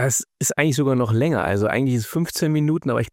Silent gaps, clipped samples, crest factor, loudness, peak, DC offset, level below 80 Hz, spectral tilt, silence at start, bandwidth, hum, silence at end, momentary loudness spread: none; under 0.1%; 16 dB; -21 LUFS; -4 dBFS; under 0.1%; -52 dBFS; -5 dB/octave; 0 s; 17 kHz; none; 0.05 s; 3 LU